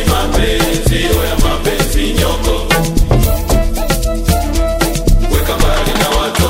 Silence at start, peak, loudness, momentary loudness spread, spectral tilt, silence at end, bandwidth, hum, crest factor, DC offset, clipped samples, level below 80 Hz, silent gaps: 0 s; 0 dBFS; -14 LUFS; 2 LU; -4.5 dB/octave; 0 s; 16.5 kHz; none; 12 dB; under 0.1%; under 0.1%; -14 dBFS; none